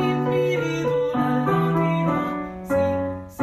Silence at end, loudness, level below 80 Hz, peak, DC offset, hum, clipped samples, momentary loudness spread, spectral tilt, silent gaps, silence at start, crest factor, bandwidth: 0 s; -23 LUFS; -50 dBFS; -10 dBFS; under 0.1%; none; under 0.1%; 6 LU; -7.5 dB/octave; none; 0 s; 12 dB; 14.5 kHz